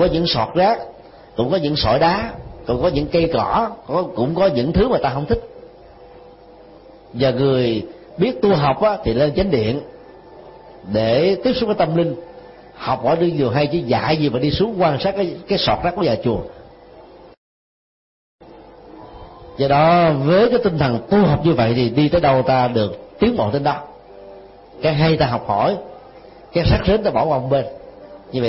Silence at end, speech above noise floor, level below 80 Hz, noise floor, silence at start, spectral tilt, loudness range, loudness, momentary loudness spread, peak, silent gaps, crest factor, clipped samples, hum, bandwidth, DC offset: 0 s; 26 dB; -38 dBFS; -43 dBFS; 0 s; -10.5 dB/octave; 6 LU; -18 LUFS; 11 LU; -4 dBFS; 17.37-18.39 s; 14 dB; under 0.1%; none; 5.8 kHz; under 0.1%